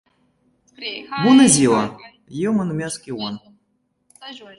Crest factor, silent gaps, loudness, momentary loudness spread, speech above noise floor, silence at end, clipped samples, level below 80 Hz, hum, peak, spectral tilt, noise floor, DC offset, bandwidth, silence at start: 18 dB; none; -18 LUFS; 24 LU; 50 dB; 0.15 s; under 0.1%; -58 dBFS; none; -2 dBFS; -4 dB/octave; -68 dBFS; under 0.1%; 11.5 kHz; 0.8 s